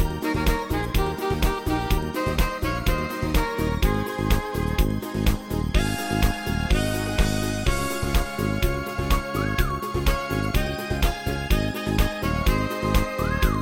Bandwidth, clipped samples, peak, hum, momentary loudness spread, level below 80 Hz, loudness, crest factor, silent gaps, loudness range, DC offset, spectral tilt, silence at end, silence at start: 17 kHz; under 0.1%; -6 dBFS; none; 2 LU; -26 dBFS; -25 LUFS; 18 dB; none; 1 LU; under 0.1%; -5.5 dB/octave; 0 s; 0 s